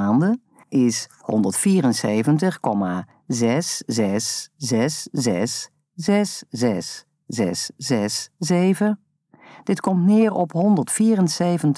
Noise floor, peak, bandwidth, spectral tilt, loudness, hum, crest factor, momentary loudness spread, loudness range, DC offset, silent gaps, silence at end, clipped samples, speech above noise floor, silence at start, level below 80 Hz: -49 dBFS; -6 dBFS; 11 kHz; -5 dB/octave; -21 LUFS; none; 14 dB; 10 LU; 4 LU; under 0.1%; none; 0 s; under 0.1%; 29 dB; 0 s; -68 dBFS